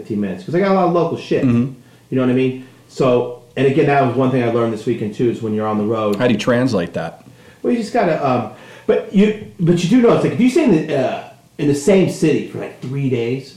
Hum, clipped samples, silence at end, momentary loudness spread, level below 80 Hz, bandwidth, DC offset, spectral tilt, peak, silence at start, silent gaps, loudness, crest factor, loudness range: none; under 0.1%; 0.05 s; 11 LU; -52 dBFS; 13.5 kHz; under 0.1%; -7 dB/octave; -4 dBFS; 0 s; none; -17 LUFS; 12 dB; 3 LU